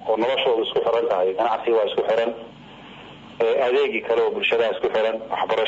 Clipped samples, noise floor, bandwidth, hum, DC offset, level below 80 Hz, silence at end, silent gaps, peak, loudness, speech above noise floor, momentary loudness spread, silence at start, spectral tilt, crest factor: under 0.1%; -42 dBFS; 7.8 kHz; none; under 0.1%; -62 dBFS; 0 s; none; -10 dBFS; -21 LUFS; 21 dB; 20 LU; 0 s; -5 dB/octave; 12 dB